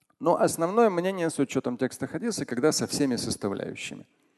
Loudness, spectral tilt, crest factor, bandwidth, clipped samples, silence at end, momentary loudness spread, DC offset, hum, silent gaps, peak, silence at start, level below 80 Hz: -27 LUFS; -4.5 dB/octave; 18 dB; 12.5 kHz; under 0.1%; 0.35 s; 11 LU; under 0.1%; none; none; -10 dBFS; 0.2 s; -62 dBFS